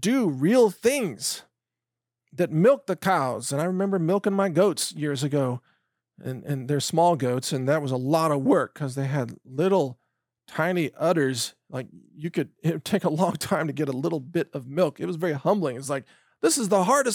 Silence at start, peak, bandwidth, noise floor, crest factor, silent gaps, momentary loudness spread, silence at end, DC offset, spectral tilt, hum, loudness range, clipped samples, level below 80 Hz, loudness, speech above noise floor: 0 s; -8 dBFS; 19 kHz; -88 dBFS; 16 dB; none; 10 LU; 0 s; under 0.1%; -5.5 dB/octave; none; 3 LU; under 0.1%; -74 dBFS; -25 LUFS; 64 dB